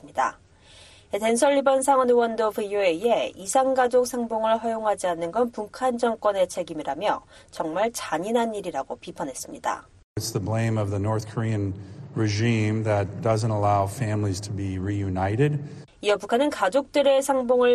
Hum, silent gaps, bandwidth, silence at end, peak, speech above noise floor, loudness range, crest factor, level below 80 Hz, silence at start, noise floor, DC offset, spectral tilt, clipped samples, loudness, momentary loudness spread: none; 10.04-10.15 s; 13 kHz; 0 s; -6 dBFS; 27 dB; 6 LU; 18 dB; -58 dBFS; 0.05 s; -51 dBFS; under 0.1%; -5.5 dB/octave; under 0.1%; -24 LUFS; 11 LU